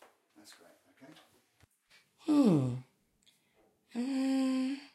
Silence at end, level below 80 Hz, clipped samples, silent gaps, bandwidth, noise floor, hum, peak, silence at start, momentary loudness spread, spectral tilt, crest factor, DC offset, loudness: 0.1 s; -78 dBFS; under 0.1%; none; 12.5 kHz; -71 dBFS; none; -14 dBFS; 0.5 s; 16 LU; -7 dB/octave; 20 dB; under 0.1%; -32 LUFS